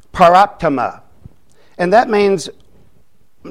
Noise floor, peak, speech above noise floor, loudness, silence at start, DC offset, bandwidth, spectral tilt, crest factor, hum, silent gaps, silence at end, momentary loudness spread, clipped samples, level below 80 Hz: -57 dBFS; 0 dBFS; 45 dB; -13 LUFS; 0.15 s; 0.7%; 13.5 kHz; -5.5 dB/octave; 16 dB; none; none; 0 s; 12 LU; under 0.1%; -46 dBFS